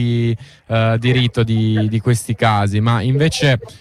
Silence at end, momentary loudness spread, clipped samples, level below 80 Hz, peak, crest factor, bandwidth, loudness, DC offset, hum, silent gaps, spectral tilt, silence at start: 0.05 s; 4 LU; under 0.1%; -44 dBFS; -4 dBFS; 12 dB; 13 kHz; -16 LUFS; under 0.1%; none; none; -6 dB/octave; 0 s